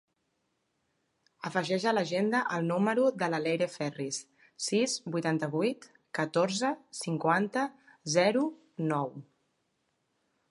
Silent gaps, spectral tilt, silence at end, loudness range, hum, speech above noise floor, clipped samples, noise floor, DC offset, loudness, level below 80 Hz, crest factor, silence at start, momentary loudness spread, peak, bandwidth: none; -4.5 dB/octave; 1.3 s; 2 LU; none; 49 dB; under 0.1%; -78 dBFS; under 0.1%; -30 LUFS; -82 dBFS; 20 dB; 1.45 s; 10 LU; -12 dBFS; 11.5 kHz